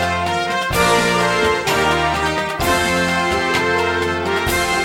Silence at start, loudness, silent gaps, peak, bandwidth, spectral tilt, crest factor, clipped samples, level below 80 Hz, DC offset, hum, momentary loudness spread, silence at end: 0 s; -17 LUFS; none; -2 dBFS; 18 kHz; -3.5 dB/octave; 16 dB; under 0.1%; -36 dBFS; under 0.1%; none; 4 LU; 0 s